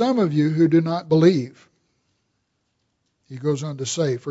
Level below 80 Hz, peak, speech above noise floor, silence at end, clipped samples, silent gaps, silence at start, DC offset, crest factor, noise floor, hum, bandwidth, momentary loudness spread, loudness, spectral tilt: -66 dBFS; -4 dBFS; 53 dB; 0 s; under 0.1%; none; 0 s; under 0.1%; 18 dB; -72 dBFS; none; 8 kHz; 11 LU; -20 LUFS; -6.5 dB/octave